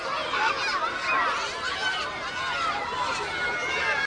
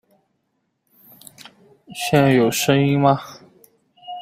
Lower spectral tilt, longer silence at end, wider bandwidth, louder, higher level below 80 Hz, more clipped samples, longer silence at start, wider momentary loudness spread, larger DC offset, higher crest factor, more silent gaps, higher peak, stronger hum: second, -1.5 dB/octave vs -5.5 dB/octave; about the same, 0 s vs 0 s; second, 10.5 kHz vs 16 kHz; second, -26 LUFS vs -17 LUFS; about the same, -56 dBFS vs -58 dBFS; neither; second, 0 s vs 1.9 s; second, 4 LU vs 22 LU; neither; about the same, 16 dB vs 20 dB; neither; second, -12 dBFS vs -2 dBFS; neither